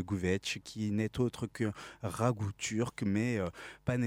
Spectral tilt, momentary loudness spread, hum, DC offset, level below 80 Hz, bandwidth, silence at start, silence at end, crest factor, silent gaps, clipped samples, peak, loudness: -5.5 dB/octave; 6 LU; none; under 0.1%; -60 dBFS; 16 kHz; 0 s; 0 s; 20 dB; none; under 0.1%; -14 dBFS; -35 LUFS